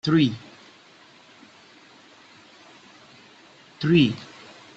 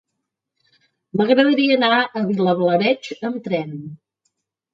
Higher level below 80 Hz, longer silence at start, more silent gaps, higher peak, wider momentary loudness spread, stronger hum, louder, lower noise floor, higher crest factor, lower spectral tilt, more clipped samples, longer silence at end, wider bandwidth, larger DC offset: first, -62 dBFS vs -70 dBFS; second, 0.05 s vs 1.15 s; neither; second, -8 dBFS vs -2 dBFS; first, 25 LU vs 12 LU; neither; second, -22 LUFS vs -18 LUFS; second, -52 dBFS vs -79 dBFS; about the same, 20 dB vs 18 dB; about the same, -7 dB/octave vs -6.5 dB/octave; neither; second, 0.5 s vs 0.8 s; about the same, 8 kHz vs 7.4 kHz; neither